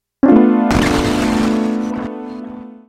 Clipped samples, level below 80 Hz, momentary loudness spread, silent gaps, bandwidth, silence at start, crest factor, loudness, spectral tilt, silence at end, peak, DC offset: under 0.1%; -34 dBFS; 18 LU; none; 14.5 kHz; 0.25 s; 14 dB; -14 LUFS; -6 dB/octave; 0.15 s; 0 dBFS; under 0.1%